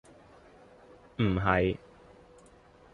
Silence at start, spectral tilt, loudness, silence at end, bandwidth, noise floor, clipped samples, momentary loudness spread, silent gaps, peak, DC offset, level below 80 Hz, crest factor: 1.2 s; -8 dB/octave; -29 LUFS; 1.2 s; 10.5 kHz; -57 dBFS; under 0.1%; 16 LU; none; -8 dBFS; under 0.1%; -48 dBFS; 26 dB